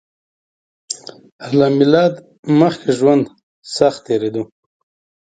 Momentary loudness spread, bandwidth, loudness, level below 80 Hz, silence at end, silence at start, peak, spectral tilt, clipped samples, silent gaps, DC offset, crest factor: 15 LU; 9.2 kHz; -15 LUFS; -60 dBFS; 0.8 s; 0.9 s; 0 dBFS; -6 dB/octave; under 0.1%; 1.32-1.39 s, 2.39-2.43 s, 3.43-3.62 s; under 0.1%; 18 dB